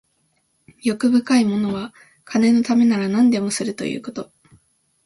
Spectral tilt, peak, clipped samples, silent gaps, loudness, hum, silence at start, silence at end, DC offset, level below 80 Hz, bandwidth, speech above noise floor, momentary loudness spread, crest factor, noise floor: -5 dB/octave; -6 dBFS; under 0.1%; none; -19 LUFS; none; 0.85 s; 0.8 s; under 0.1%; -62 dBFS; 11.5 kHz; 48 dB; 14 LU; 14 dB; -66 dBFS